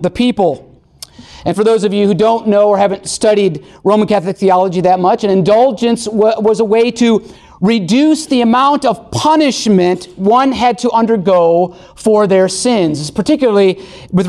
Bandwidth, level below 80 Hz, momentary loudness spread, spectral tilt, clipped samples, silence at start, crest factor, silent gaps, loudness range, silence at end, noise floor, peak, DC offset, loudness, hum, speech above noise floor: 12.5 kHz; -46 dBFS; 6 LU; -5.5 dB/octave; under 0.1%; 0 s; 10 dB; none; 1 LU; 0 s; -37 dBFS; -2 dBFS; under 0.1%; -12 LUFS; none; 26 dB